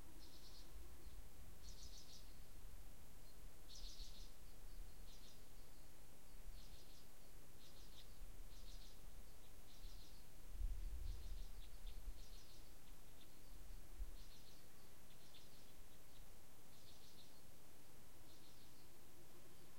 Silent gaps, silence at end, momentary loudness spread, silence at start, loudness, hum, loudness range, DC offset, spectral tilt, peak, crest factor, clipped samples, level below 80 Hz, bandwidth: none; 0 s; 9 LU; 0 s; -62 LUFS; none; 7 LU; 0.4%; -3.5 dB/octave; -34 dBFS; 22 dB; under 0.1%; -58 dBFS; 16.5 kHz